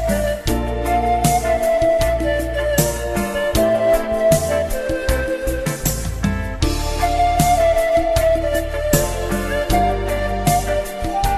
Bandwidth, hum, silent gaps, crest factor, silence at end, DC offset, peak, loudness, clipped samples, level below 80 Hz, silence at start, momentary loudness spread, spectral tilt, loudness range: 14 kHz; none; none; 16 dB; 0 s; under 0.1%; -2 dBFS; -18 LUFS; under 0.1%; -26 dBFS; 0 s; 6 LU; -5 dB/octave; 2 LU